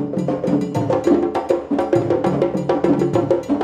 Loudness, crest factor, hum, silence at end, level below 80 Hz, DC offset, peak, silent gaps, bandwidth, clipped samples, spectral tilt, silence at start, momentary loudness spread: -19 LUFS; 14 dB; none; 0 s; -52 dBFS; under 0.1%; -4 dBFS; none; 9.8 kHz; under 0.1%; -8 dB/octave; 0 s; 3 LU